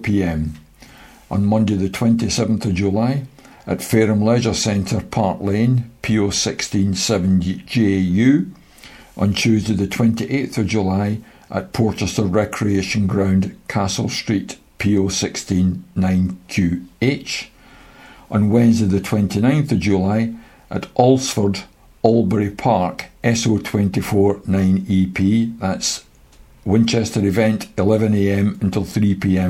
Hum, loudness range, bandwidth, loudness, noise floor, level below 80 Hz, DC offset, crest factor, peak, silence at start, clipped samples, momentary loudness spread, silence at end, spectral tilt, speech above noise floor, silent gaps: none; 2 LU; 15.5 kHz; -18 LUFS; -47 dBFS; -44 dBFS; under 0.1%; 18 dB; 0 dBFS; 0 s; under 0.1%; 8 LU; 0 s; -6 dB/octave; 29 dB; none